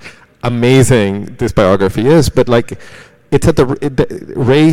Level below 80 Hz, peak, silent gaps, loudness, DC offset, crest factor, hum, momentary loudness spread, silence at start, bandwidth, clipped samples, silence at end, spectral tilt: -32 dBFS; 0 dBFS; none; -12 LUFS; under 0.1%; 12 dB; none; 9 LU; 0.05 s; 16.5 kHz; 0.4%; 0 s; -6.5 dB/octave